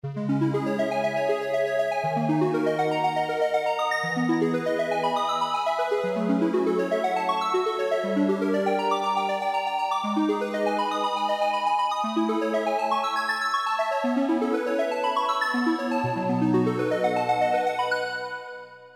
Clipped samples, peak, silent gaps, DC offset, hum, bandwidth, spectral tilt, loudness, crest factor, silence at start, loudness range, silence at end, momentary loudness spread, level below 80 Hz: under 0.1%; -12 dBFS; none; under 0.1%; none; 16 kHz; -5.5 dB/octave; -25 LUFS; 14 dB; 0.05 s; 1 LU; 0.05 s; 2 LU; -76 dBFS